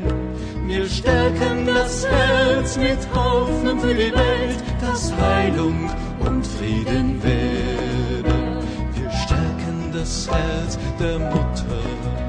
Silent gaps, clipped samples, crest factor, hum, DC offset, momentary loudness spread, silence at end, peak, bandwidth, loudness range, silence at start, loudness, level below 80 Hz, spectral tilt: none; under 0.1%; 16 dB; none; under 0.1%; 8 LU; 0 s; -4 dBFS; 10.5 kHz; 4 LU; 0 s; -21 LUFS; -26 dBFS; -5.5 dB/octave